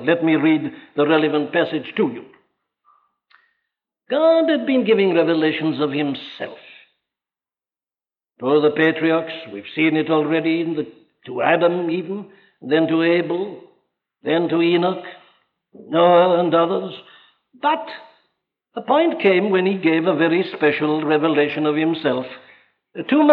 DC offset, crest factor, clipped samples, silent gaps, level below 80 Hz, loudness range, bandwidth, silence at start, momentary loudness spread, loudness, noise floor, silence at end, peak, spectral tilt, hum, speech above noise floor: under 0.1%; 18 dB; under 0.1%; none; -76 dBFS; 4 LU; 4.7 kHz; 0 s; 16 LU; -19 LUFS; under -90 dBFS; 0 s; -2 dBFS; -9 dB/octave; none; over 72 dB